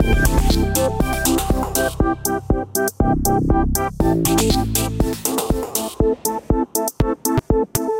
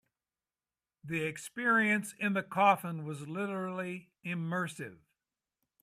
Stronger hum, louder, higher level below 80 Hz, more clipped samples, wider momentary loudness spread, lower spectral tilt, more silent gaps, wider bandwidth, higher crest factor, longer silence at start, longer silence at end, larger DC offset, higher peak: neither; first, -19 LUFS vs -33 LUFS; first, -24 dBFS vs -80 dBFS; neither; second, 4 LU vs 13 LU; about the same, -5 dB/octave vs -5.5 dB/octave; neither; first, 17 kHz vs 15 kHz; second, 18 dB vs 24 dB; second, 0 s vs 1.05 s; second, 0 s vs 0.85 s; neither; first, 0 dBFS vs -12 dBFS